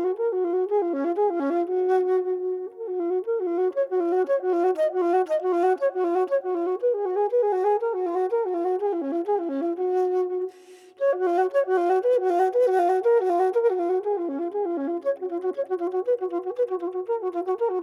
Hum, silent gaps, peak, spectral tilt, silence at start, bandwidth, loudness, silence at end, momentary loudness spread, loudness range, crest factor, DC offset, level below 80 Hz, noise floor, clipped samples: none; none; -12 dBFS; -5 dB/octave; 0 s; 6.6 kHz; -24 LUFS; 0 s; 6 LU; 4 LU; 12 dB; under 0.1%; under -90 dBFS; -49 dBFS; under 0.1%